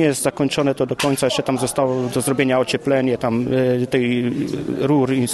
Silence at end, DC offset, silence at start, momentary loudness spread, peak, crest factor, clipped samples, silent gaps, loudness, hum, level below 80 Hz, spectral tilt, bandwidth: 0 s; under 0.1%; 0 s; 3 LU; -2 dBFS; 16 dB; under 0.1%; none; -19 LUFS; none; -52 dBFS; -5 dB/octave; 13 kHz